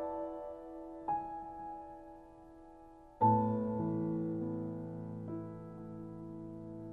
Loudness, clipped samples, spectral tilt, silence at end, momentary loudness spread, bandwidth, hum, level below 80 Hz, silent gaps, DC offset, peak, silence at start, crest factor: -38 LUFS; under 0.1%; -11.5 dB/octave; 0 s; 24 LU; 3.8 kHz; none; -64 dBFS; none; under 0.1%; -18 dBFS; 0 s; 20 dB